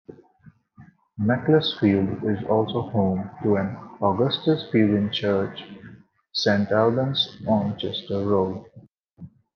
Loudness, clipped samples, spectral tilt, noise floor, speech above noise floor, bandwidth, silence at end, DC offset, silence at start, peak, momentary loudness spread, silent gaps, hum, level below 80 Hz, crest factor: -23 LUFS; under 0.1%; -7 dB/octave; -54 dBFS; 32 dB; 6.6 kHz; 0.3 s; under 0.1%; 0.1 s; -6 dBFS; 10 LU; none; none; -64 dBFS; 18 dB